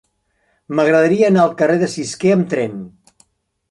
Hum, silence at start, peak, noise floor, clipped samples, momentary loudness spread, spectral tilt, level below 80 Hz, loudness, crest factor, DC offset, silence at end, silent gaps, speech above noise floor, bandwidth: none; 0.7 s; -2 dBFS; -64 dBFS; under 0.1%; 10 LU; -6 dB/octave; -60 dBFS; -15 LUFS; 14 dB; under 0.1%; 0.8 s; none; 50 dB; 11.5 kHz